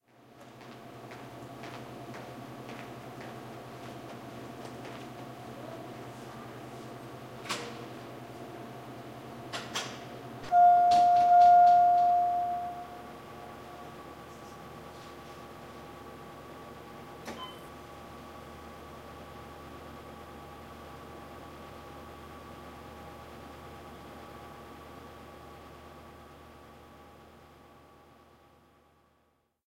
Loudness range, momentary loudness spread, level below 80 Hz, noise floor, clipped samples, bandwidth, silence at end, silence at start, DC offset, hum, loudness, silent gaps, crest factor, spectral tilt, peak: 24 LU; 25 LU; -62 dBFS; -72 dBFS; under 0.1%; 16 kHz; 5.15 s; 0.7 s; under 0.1%; none; -25 LUFS; none; 20 dB; -5 dB/octave; -14 dBFS